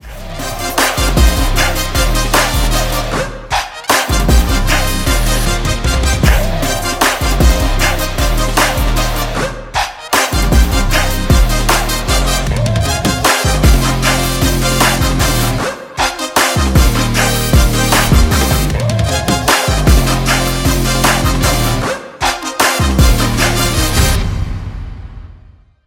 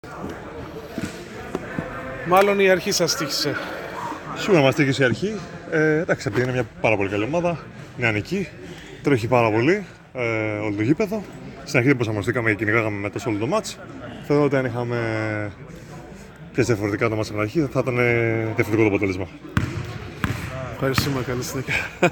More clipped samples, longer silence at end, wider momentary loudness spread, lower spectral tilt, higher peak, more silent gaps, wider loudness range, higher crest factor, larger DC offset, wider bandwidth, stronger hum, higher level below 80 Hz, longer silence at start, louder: neither; first, 0.55 s vs 0 s; second, 7 LU vs 15 LU; second, -4 dB/octave vs -5.5 dB/octave; about the same, 0 dBFS vs -2 dBFS; neither; about the same, 2 LU vs 4 LU; second, 12 dB vs 22 dB; neither; second, 17 kHz vs 19 kHz; neither; first, -16 dBFS vs -48 dBFS; about the same, 0.05 s vs 0.05 s; first, -13 LUFS vs -22 LUFS